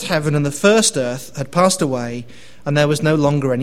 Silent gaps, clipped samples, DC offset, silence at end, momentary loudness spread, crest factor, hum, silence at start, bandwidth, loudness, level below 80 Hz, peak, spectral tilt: none; under 0.1%; 1%; 0 s; 13 LU; 16 dB; none; 0 s; 16 kHz; -17 LUFS; -50 dBFS; 0 dBFS; -4.5 dB/octave